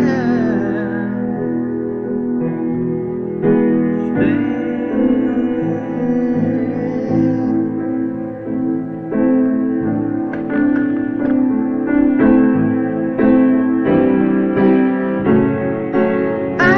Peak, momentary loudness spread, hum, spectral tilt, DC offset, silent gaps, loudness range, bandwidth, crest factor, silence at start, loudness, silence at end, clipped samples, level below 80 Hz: -2 dBFS; 7 LU; none; -9.5 dB/octave; under 0.1%; none; 4 LU; 6.2 kHz; 14 dB; 0 s; -16 LUFS; 0 s; under 0.1%; -46 dBFS